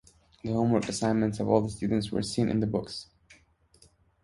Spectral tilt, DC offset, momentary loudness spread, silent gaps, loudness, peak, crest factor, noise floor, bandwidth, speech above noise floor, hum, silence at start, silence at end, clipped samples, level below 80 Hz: -6 dB/octave; under 0.1%; 8 LU; none; -28 LUFS; -8 dBFS; 20 dB; -62 dBFS; 11.5 kHz; 34 dB; none; 0.45 s; 0.9 s; under 0.1%; -54 dBFS